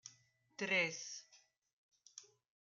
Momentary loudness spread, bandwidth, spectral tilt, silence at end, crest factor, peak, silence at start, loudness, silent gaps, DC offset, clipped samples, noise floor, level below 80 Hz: 23 LU; 10 kHz; -2 dB/octave; 0.4 s; 22 dB; -22 dBFS; 0.05 s; -38 LUFS; 1.58-1.62 s, 1.73-1.92 s; under 0.1%; under 0.1%; -71 dBFS; under -90 dBFS